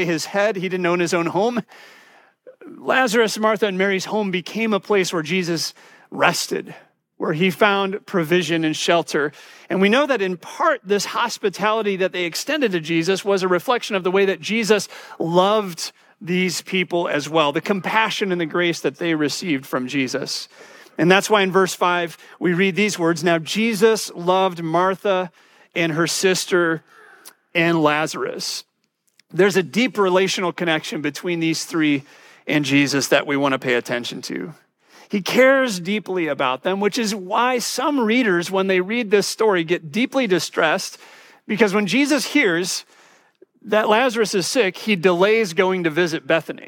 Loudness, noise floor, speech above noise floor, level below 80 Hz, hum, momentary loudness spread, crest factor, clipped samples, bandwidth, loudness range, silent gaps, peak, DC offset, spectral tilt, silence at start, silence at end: -20 LUFS; -69 dBFS; 49 dB; -76 dBFS; none; 9 LU; 20 dB; under 0.1%; 17.5 kHz; 2 LU; none; -2 dBFS; under 0.1%; -4 dB/octave; 0 s; 0 s